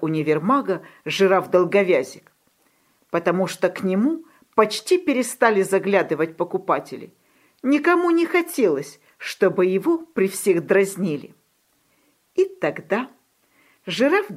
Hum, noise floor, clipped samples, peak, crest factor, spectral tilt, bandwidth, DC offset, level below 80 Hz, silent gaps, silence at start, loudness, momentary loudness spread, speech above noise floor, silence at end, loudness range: none; -65 dBFS; under 0.1%; -2 dBFS; 20 dB; -5 dB/octave; 15.5 kHz; under 0.1%; -74 dBFS; none; 0 s; -21 LUFS; 11 LU; 45 dB; 0 s; 3 LU